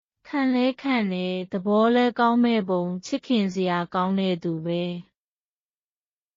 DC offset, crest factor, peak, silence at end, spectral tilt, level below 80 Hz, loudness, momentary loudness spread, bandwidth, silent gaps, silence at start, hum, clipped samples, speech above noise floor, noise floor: under 0.1%; 14 dB; -10 dBFS; 1.35 s; -5 dB/octave; -68 dBFS; -24 LUFS; 8 LU; 7.4 kHz; none; 0.25 s; none; under 0.1%; over 67 dB; under -90 dBFS